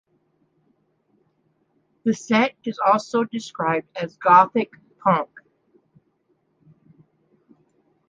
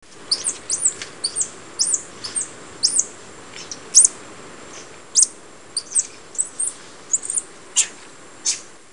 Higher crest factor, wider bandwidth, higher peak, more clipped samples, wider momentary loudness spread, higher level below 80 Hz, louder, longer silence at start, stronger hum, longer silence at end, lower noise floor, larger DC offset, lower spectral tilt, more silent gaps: about the same, 22 dB vs 24 dB; second, 9.2 kHz vs 17 kHz; about the same, -2 dBFS vs 0 dBFS; neither; second, 13 LU vs 22 LU; second, -72 dBFS vs -64 dBFS; about the same, -21 LUFS vs -19 LUFS; first, 2.05 s vs 0.15 s; neither; first, 2.85 s vs 0.25 s; first, -68 dBFS vs -43 dBFS; second, under 0.1% vs 0.5%; first, -5.5 dB/octave vs 1.5 dB/octave; neither